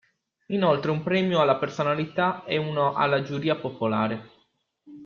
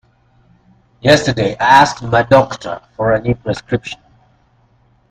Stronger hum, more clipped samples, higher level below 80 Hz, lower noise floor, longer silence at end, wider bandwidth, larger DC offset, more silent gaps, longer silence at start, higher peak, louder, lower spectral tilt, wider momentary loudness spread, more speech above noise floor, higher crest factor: neither; neither; second, -66 dBFS vs -42 dBFS; first, -68 dBFS vs -54 dBFS; second, 0 s vs 1.15 s; second, 7.2 kHz vs 15 kHz; neither; neither; second, 0.5 s vs 1.05 s; second, -8 dBFS vs 0 dBFS; second, -25 LUFS vs -14 LUFS; first, -7 dB/octave vs -5 dB/octave; second, 6 LU vs 15 LU; about the same, 44 dB vs 41 dB; about the same, 18 dB vs 16 dB